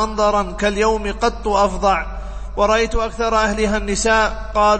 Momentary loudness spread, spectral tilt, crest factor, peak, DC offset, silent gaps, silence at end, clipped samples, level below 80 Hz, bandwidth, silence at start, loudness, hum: 5 LU; -4 dB/octave; 14 dB; -4 dBFS; under 0.1%; none; 0 s; under 0.1%; -28 dBFS; 8.8 kHz; 0 s; -18 LUFS; none